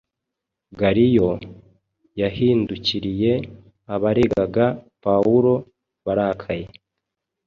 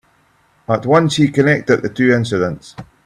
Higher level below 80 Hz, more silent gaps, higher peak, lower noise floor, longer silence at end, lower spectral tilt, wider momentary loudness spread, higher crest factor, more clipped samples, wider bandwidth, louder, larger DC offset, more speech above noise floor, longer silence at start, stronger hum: about the same, -48 dBFS vs -50 dBFS; neither; second, -4 dBFS vs 0 dBFS; first, -83 dBFS vs -56 dBFS; first, 0.8 s vs 0.2 s; first, -8 dB/octave vs -6 dB/octave; first, 14 LU vs 9 LU; about the same, 18 dB vs 16 dB; neither; second, 7 kHz vs 12.5 kHz; second, -20 LUFS vs -15 LUFS; neither; first, 64 dB vs 41 dB; about the same, 0.7 s vs 0.7 s; neither